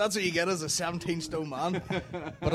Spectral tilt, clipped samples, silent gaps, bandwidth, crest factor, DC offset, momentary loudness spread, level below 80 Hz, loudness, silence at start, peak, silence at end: -4 dB/octave; under 0.1%; none; 16 kHz; 16 dB; under 0.1%; 7 LU; -54 dBFS; -31 LUFS; 0 s; -14 dBFS; 0 s